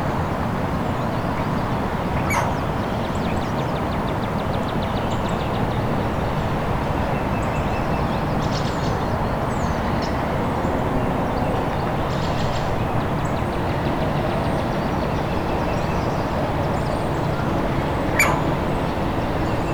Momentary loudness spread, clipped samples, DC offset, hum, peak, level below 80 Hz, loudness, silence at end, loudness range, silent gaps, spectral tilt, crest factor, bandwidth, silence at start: 2 LU; under 0.1%; under 0.1%; none; -6 dBFS; -32 dBFS; -23 LUFS; 0 s; 1 LU; none; -6.5 dB/octave; 16 dB; over 20 kHz; 0 s